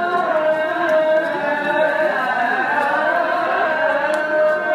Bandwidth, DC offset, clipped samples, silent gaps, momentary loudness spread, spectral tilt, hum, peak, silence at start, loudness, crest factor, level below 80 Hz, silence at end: 13 kHz; under 0.1%; under 0.1%; none; 2 LU; -4.5 dB/octave; none; -6 dBFS; 0 s; -18 LUFS; 12 dB; -72 dBFS; 0 s